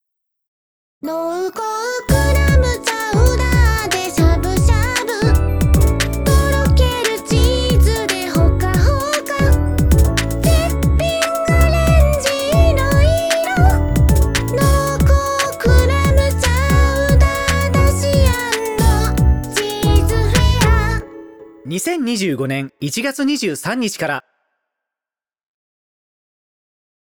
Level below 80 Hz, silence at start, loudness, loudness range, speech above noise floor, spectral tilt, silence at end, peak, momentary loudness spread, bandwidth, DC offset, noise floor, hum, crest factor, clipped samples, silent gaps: -18 dBFS; 1.05 s; -15 LUFS; 6 LU; over 70 dB; -5.5 dB/octave; 2.9 s; 0 dBFS; 7 LU; over 20 kHz; 0.1%; under -90 dBFS; none; 14 dB; under 0.1%; none